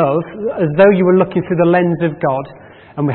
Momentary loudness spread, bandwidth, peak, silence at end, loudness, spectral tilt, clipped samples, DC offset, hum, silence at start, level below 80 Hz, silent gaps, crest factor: 12 LU; 4.3 kHz; 0 dBFS; 0 s; -14 LUFS; -13.5 dB/octave; under 0.1%; under 0.1%; none; 0 s; -52 dBFS; none; 14 dB